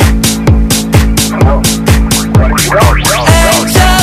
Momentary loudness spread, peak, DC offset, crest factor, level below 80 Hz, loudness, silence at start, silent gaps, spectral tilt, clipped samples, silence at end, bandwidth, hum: 3 LU; 0 dBFS; 0.4%; 8 dB; -12 dBFS; -8 LUFS; 0 s; none; -4.5 dB/octave; 2%; 0 s; 16 kHz; none